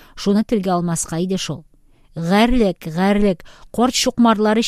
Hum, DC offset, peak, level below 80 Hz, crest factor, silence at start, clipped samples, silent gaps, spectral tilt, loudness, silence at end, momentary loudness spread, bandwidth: none; under 0.1%; -2 dBFS; -36 dBFS; 16 dB; 0.15 s; under 0.1%; none; -5 dB/octave; -18 LUFS; 0 s; 12 LU; 15.5 kHz